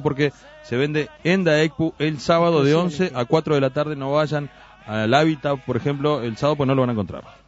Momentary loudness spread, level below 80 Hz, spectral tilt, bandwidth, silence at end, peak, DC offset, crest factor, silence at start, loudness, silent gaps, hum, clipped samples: 7 LU; -52 dBFS; -6.5 dB/octave; 8 kHz; 0.15 s; -4 dBFS; under 0.1%; 18 dB; 0 s; -21 LUFS; none; none; under 0.1%